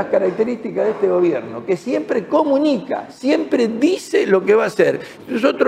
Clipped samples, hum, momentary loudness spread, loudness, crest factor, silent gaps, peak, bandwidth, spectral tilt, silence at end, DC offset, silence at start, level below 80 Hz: under 0.1%; none; 8 LU; -18 LUFS; 16 dB; none; -2 dBFS; 14 kHz; -6 dB/octave; 0 s; under 0.1%; 0 s; -64 dBFS